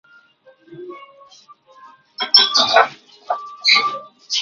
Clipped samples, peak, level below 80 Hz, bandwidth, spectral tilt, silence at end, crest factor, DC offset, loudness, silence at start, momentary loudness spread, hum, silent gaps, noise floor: under 0.1%; 0 dBFS; -70 dBFS; 7.6 kHz; 0.5 dB/octave; 0 s; 20 dB; under 0.1%; -15 LUFS; 0.7 s; 24 LU; none; none; -52 dBFS